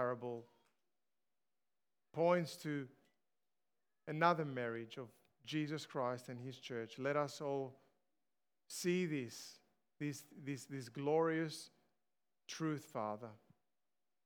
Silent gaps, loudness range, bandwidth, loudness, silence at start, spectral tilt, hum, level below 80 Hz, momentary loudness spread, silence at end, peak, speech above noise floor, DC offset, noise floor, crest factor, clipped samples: none; 4 LU; 20 kHz; -41 LUFS; 0 s; -5.5 dB/octave; none; under -90 dBFS; 16 LU; 0.9 s; -18 dBFS; over 49 dB; under 0.1%; under -90 dBFS; 24 dB; under 0.1%